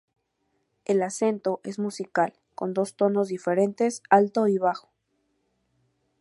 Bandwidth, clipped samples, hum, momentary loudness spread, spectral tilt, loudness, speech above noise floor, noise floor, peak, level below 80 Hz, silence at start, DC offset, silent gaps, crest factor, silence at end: 11.5 kHz; under 0.1%; none; 10 LU; -6 dB/octave; -25 LUFS; 50 dB; -74 dBFS; -4 dBFS; -78 dBFS; 0.9 s; under 0.1%; none; 22 dB; 1.4 s